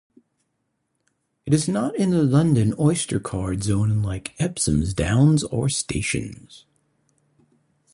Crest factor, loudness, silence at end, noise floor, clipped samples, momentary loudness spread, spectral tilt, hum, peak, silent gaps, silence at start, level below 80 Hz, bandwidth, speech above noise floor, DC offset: 18 dB; -22 LUFS; 1.35 s; -74 dBFS; under 0.1%; 9 LU; -5.5 dB/octave; none; -6 dBFS; none; 1.45 s; -42 dBFS; 11.5 kHz; 53 dB; under 0.1%